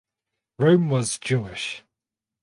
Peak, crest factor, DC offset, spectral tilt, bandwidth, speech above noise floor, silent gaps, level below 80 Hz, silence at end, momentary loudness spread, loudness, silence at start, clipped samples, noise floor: -6 dBFS; 18 dB; under 0.1%; -5.5 dB/octave; 11.5 kHz; 66 dB; none; -60 dBFS; 0.65 s; 13 LU; -23 LUFS; 0.6 s; under 0.1%; -87 dBFS